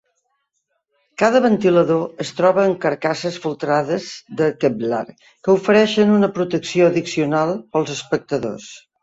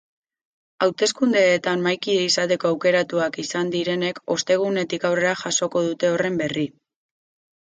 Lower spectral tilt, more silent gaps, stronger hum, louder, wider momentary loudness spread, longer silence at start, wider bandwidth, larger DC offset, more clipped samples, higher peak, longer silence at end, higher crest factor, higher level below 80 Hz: first, -6 dB/octave vs -3.5 dB/octave; neither; neither; first, -18 LUFS vs -21 LUFS; first, 11 LU vs 6 LU; first, 1.2 s vs 0.8 s; second, 8 kHz vs 9.6 kHz; neither; neither; first, -2 dBFS vs -6 dBFS; second, 0.25 s vs 1.05 s; about the same, 18 dB vs 18 dB; first, -60 dBFS vs -68 dBFS